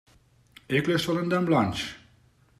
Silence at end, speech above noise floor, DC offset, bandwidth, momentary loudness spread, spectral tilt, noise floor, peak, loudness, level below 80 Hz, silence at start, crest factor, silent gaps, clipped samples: 0.6 s; 36 dB; under 0.1%; 14.5 kHz; 8 LU; -6 dB/octave; -61 dBFS; -10 dBFS; -26 LUFS; -58 dBFS; 0.7 s; 18 dB; none; under 0.1%